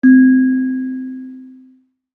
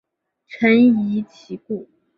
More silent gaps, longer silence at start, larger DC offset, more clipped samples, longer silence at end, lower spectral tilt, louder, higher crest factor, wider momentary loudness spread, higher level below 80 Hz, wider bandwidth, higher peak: neither; second, 0.05 s vs 0.5 s; neither; neither; first, 0.65 s vs 0.35 s; first, -9.5 dB/octave vs -8 dB/octave; first, -13 LUFS vs -17 LUFS; about the same, 14 dB vs 16 dB; first, 22 LU vs 18 LU; second, -72 dBFS vs -64 dBFS; second, 1.8 kHz vs 6 kHz; about the same, -2 dBFS vs -4 dBFS